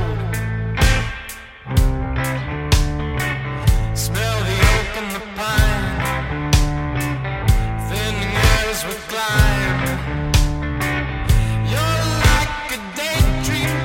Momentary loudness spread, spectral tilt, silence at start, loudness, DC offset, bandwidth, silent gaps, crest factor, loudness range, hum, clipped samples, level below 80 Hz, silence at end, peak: 7 LU; -4.5 dB/octave; 0 s; -19 LUFS; under 0.1%; 17 kHz; none; 18 dB; 2 LU; none; under 0.1%; -22 dBFS; 0 s; -2 dBFS